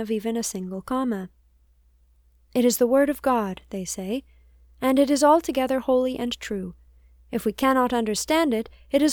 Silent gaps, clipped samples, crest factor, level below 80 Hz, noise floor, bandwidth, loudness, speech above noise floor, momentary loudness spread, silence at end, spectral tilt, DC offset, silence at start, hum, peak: none; under 0.1%; 18 dB; -52 dBFS; -59 dBFS; over 20 kHz; -24 LUFS; 37 dB; 13 LU; 0 s; -4 dB/octave; under 0.1%; 0 s; none; -6 dBFS